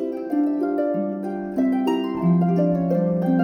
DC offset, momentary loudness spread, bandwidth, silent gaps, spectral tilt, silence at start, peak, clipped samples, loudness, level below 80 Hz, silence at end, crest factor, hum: under 0.1%; 6 LU; 6.8 kHz; none; -9.5 dB/octave; 0 s; -10 dBFS; under 0.1%; -22 LUFS; -58 dBFS; 0 s; 12 dB; none